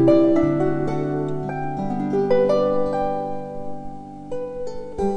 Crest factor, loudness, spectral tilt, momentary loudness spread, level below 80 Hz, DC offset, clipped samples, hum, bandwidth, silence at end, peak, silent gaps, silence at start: 16 dB; -22 LUFS; -8.5 dB/octave; 15 LU; -44 dBFS; under 0.1%; under 0.1%; none; 9.2 kHz; 0 s; -6 dBFS; none; 0 s